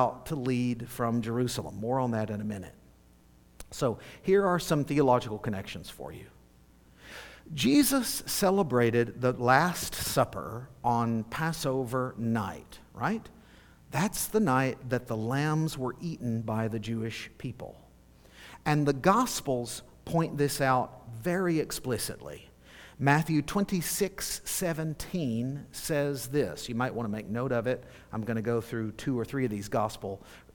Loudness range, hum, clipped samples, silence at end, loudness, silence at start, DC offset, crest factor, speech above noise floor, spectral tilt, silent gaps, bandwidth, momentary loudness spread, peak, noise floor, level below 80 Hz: 5 LU; none; under 0.1%; 0.15 s; -30 LUFS; 0 s; under 0.1%; 24 dB; 29 dB; -5 dB/octave; none; 19 kHz; 15 LU; -6 dBFS; -59 dBFS; -54 dBFS